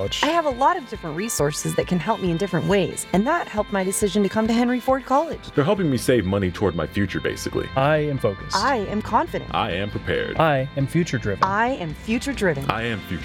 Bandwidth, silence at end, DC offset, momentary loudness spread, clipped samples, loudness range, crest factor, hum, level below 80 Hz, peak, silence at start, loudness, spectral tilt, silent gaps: 17 kHz; 0 s; under 0.1%; 5 LU; under 0.1%; 2 LU; 22 dB; none; -42 dBFS; 0 dBFS; 0 s; -22 LUFS; -5 dB/octave; none